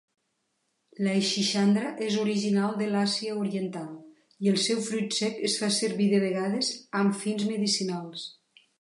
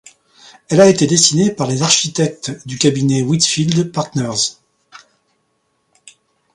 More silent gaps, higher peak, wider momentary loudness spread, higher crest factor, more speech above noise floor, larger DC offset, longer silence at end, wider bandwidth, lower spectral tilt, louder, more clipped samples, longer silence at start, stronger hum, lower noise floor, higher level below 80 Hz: neither; second, -14 dBFS vs 0 dBFS; about the same, 10 LU vs 9 LU; about the same, 14 dB vs 16 dB; about the same, 50 dB vs 51 dB; neither; second, 0.5 s vs 1.6 s; about the same, 11.5 kHz vs 11.5 kHz; about the same, -4.5 dB/octave vs -4 dB/octave; second, -27 LUFS vs -14 LUFS; neither; first, 1 s vs 0.7 s; neither; first, -77 dBFS vs -65 dBFS; second, -78 dBFS vs -54 dBFS